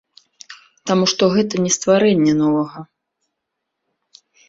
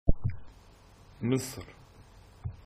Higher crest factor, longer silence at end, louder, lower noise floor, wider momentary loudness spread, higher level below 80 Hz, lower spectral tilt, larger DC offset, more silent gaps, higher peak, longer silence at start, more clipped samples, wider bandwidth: second, 18 dB vs 24 dB; first, 1.65 s vs 0.15 s; first, -16 LUFS vs -35 LUFS; first, -78 dBFS vs -56 dBFS; second, 12 LU vs 26 LU; second, -58 dBFS vs -38 dBFS; second, -4.5 dB/octave vs -6.5 dB/octave; neither; neither; first, -2 dBFS vs -8 dBFS; first, 0.5 s vs 0.05 s; neither; second, 7.8 kHz vs 15 kHz